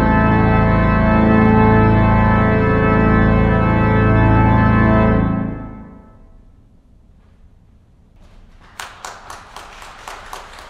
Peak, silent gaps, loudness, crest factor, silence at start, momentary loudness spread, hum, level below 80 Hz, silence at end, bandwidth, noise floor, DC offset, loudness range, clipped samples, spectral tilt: 0 dBFS; none; -14 LUFS; 16 dB; 0 s; 22 LU; none; -24 dBFS; 0.05 s; 8.8 kHz; -49 dBFS; under 0.1%; 18 LU; under 0.1%; -8.5 dB/octave